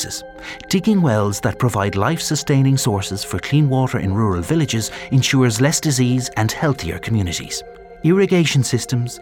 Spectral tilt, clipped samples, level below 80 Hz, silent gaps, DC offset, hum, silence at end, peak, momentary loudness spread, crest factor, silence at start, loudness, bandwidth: -5 dB/octave; under 0.1%; -46 dBFS; none; under 0.1%; none; 0 s; -2 dBFS; 9 LU; 16 dB; 0 s; -18 LUFS; 17.5 kHz